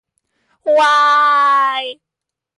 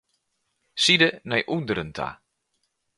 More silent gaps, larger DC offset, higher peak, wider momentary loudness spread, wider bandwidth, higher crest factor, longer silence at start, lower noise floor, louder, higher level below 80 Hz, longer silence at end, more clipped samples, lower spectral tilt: neither; neither; about the same, -6 dBFS vs -4 dBFS; second, 13 LU vs 16 LU; about the same, 11.5 kHz vs 11.5 kHz; second, 10 dB vs 22 dB; about the same, 0.65 s vs 0.75 s; second, -65 dBFS vs -75 dBFS; first, -12 LUFS vs -22 LUFS; second, -70 dBFS vs -58 dBFS; second, 0.65 s vs 0.85 s; neither; second, 0 dB/octave vs -3.5 dB/octave